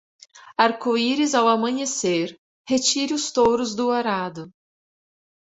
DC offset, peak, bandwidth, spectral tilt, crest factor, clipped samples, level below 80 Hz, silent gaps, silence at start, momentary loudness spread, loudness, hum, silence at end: under 0.1%; -2 dBFS; 8.4 kHz; -3 dB/octave; 20 dB; under 0.1%; -60 dBFS; 2.38-2.65 s; 0.35 s; 8 LU; -21 LUFS; none; 0.95 s